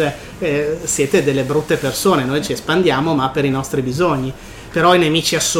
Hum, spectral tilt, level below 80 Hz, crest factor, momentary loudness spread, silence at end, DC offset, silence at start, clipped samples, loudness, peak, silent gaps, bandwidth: none; -4 dB/octave; -42 dBFS; 14 dB; 8 LU; 0 s; under 0.1%; 0 s; under 0.1%; -17 LUFS; -2 dBFS; none; 16.5 kHz